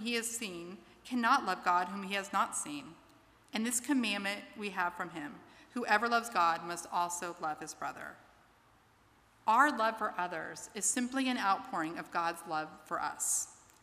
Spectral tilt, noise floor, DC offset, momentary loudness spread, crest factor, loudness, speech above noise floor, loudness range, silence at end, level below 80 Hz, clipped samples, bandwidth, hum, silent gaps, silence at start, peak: -2 dB/octave; -66 dBFS; under 0.1%; 13 LU; 22 dB; -34 LUFS; 32 dB; 3 LU; 0.3 s; -76 dBFS; under 0.1%; 15.5 kHz; none; none; 0 s; -12 dBFS